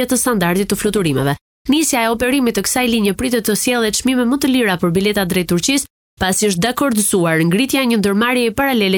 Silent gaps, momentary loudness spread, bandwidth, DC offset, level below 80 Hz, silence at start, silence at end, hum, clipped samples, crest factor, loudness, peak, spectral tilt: 1.41-1.65 s, 5.90-6.17 s; 3 LU; 19.5 kHz; under 0.1%; -42 dBFS; 0 s; 0 s; none; under 0.1%; 12 dB; -15 LUFS; -4 dBFS; -4 dB/octave